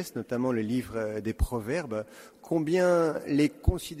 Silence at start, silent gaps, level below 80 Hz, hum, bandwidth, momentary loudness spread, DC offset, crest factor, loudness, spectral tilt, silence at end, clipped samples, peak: 0 s; none; -40 dBFS; none; 16 kHz; 9 LU; under 0.1%; 18 dB; -29 LUFS; -6.5 dB/octave; 0 s; under 0.1%; -10 dBFS